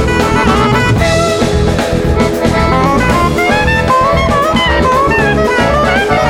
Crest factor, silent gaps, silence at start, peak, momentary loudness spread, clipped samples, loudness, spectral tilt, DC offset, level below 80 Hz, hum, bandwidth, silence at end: 10 dB; none; 0 s; 0 dBFS; 2 LU; under 0.1%; -10 LUFS; -5.5 dB/octave; under 0.1%; -20 dBFS; none; 17.5 kHz; 0 s